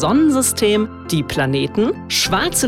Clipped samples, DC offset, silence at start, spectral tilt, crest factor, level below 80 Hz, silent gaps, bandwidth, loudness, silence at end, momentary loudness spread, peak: under 0.1%; under 0.1%; 0 s; -4 dB/octave; 12 dB; -42 dBFS; none; 17 kHz; -17 LUFS; 0 s; 6 LU; -4 dBFS